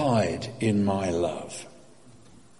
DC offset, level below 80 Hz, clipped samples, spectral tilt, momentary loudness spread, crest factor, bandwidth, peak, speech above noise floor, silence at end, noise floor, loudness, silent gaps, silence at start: 0.2%; -56 dBFS; under 0.1%; -6 dB/octave; 15 LU; 18 dB; 11.5 kHz; -10 dBFS; 27 dB; 0.9 s; -54 dBFS; -27 LUFS; none; 0 s